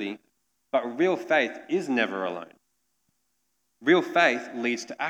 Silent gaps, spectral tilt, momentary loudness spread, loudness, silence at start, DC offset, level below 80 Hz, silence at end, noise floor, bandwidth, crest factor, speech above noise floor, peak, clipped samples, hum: none; -4.5 dB/octave; 11 LU; -25 LUFS; 0 s; under 0.1%; -88 dBFS; 0 s; -76 dBFS; 11.5 kHz; 20 dB; 50 dB; -6 dBFS; under 0.1%; none